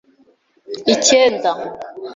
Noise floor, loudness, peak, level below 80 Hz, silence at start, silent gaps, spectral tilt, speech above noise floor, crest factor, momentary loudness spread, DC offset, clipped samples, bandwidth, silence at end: -56 dBFS; -15 LUFS; 0 dBFS; -60 dBFS; 0.7 s; none; -1.5 dB/octave; 40 dB; 18 dB; 19 LU; under 0.1%; under 0.1%; 7.8 kHz; 0 s